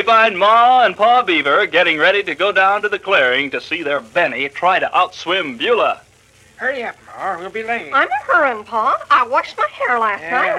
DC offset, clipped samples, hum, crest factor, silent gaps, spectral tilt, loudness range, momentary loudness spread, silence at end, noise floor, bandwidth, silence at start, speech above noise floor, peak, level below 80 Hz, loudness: under 0.1%; under 0.1%; none; 14 dB; none; -3.5 dB/octave; 6 LU; 10 LU; 0 s; -49 dBFS; 11.5 kHz; 0 s; 34 dB; -2 dBFS; -60 dBFS; -15 LUFS